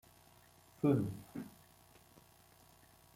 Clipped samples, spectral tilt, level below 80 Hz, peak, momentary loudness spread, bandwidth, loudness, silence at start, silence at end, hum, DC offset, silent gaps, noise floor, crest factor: under 0.1%; -8.5 dB/octave; -70 dBFS; -18 dBFS; 17 LU; 16.5 kHz; -37 LUFS; 0.85 s; 1.65 s; 60 Hz at -70 dBFS; under 0.1%; none; -65 dBFS; 22 dB